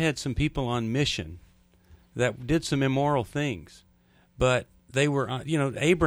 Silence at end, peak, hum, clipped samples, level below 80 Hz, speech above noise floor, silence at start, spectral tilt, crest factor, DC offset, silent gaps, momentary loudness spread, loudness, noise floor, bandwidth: 0 s; -8 dBFS; none; under 0.1%; -46 dBFS; 35 dB; 0 s; -5.5 dB/octave; 18 dB; under 0.1%; none; 7 LU; -27 LUFS; -61 dBFS; 13.5 kHz